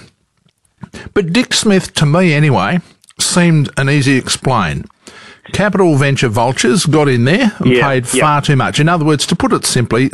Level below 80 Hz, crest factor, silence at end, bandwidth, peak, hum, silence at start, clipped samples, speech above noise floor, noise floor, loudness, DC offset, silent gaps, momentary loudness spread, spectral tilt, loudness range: -40 dBFS; 12 dB; 0.05 s; 13 kHz; 0 dBFS; none; 0.95 s; under 0.1%; 47 dB; -58 dBFS; -12 LUFS; 0.8%; none; 5 LU; -5 dB/octave; 2 LU